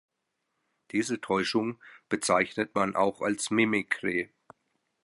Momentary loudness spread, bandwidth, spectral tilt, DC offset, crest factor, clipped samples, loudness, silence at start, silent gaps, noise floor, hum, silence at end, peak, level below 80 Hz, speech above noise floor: 8 LU; 11.5 kHz; -4 dB/octave; under 0.1%; 20 dB; under 0.1%; -28 LUFS; 0.95 s; none; -81 dBFS; none; 0.8 s; -10 dBFS; -68 dBFS; 53 dB